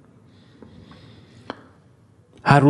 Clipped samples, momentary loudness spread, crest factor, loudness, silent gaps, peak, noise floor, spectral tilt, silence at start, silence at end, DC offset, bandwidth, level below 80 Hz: under 0.1%; 24 LU; 24 dB; -25 LUFS; none; 0 dBFS; -54 dBFS; -7.5 dB/octave; 2.45 s; 0 s; under 0.1%; 10 kHz; -56 dBFS